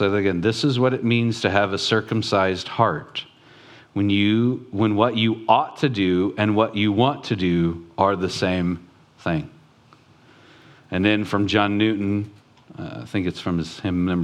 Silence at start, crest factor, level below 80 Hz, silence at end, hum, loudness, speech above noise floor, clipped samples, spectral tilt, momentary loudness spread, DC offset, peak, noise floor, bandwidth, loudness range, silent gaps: 0 s; 22 dB; -54 dBFS; 0 s; none; -21 LUFS; 32 dB; under 0.1%; -6.5 dB/octave; 9 LU; under 0.1%; 0 dBFS; -53 dBFS; 11.5 kHz; 5 LU; none